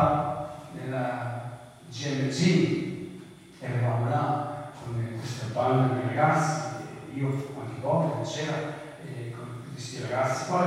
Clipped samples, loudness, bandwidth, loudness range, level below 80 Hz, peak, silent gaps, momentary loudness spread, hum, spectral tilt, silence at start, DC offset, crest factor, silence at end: under 0.1%; -29 LUFS; 13 kHz; 4 LU; -62 dBFS; -10 dBFS; none; 15 LU; none; -6 dB/octave; 0 s; under 0.1%; 18 dB; 0 s